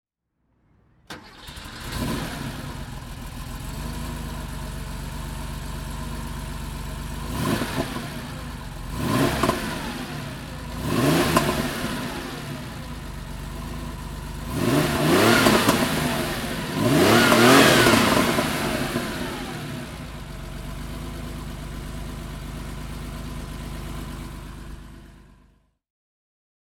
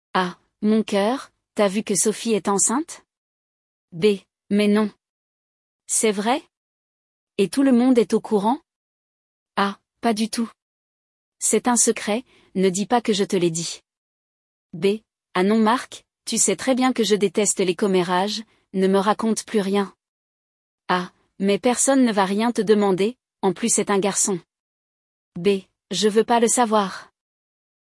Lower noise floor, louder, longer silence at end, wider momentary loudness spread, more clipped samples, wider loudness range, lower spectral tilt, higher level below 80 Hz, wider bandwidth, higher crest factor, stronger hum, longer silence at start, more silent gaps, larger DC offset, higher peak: second, -72 dBFS vs under -90 dBFS; about the same, -23 LUFS vs -21 LUFS; first, 1.45 s vs 0.85 s; first, 19 LU vs 12 LU; neither; first, 17 LU vs 4 LU; about the same, -4.5 dB/octave vs -4 dB/octave; first, -38 dBFS vs -68 dBFS; first, 19 kHz vs 12 kHz; first, 24 dB vs 18 dB; neither; first, 1.1 s vs 0.15 s; second, none vs 3.17-3.88 s, 5.09-5.79 s, 6.57-7.27 s, 8.76-9.46 s, 10.62-11.32 s, 13.97-14.70 s, 20.09-20.78 s, 24.60-25.32 s; neither; first, -2 dBFS vs -6 dBFS